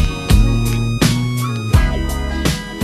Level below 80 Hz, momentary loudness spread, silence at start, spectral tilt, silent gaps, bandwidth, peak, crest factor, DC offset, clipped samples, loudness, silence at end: -20 dBFS; 5 LU; 0 s; -5.5 dB/octave; none; 14 kHz; 0 dBFS; 14 dB; under 0.1%; under 0.1%; -17 LUFS; 0 s